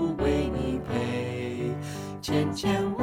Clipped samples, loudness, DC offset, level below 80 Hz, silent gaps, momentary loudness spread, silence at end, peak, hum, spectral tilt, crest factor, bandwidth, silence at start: under 0.1%; -29 LUFS; under 0.1%; -42 dBFS; none; 7 LU; 0 s; -12 dBFS; none; -6.5 dB/octave; 14 dB; 16.5 kHz; 0 s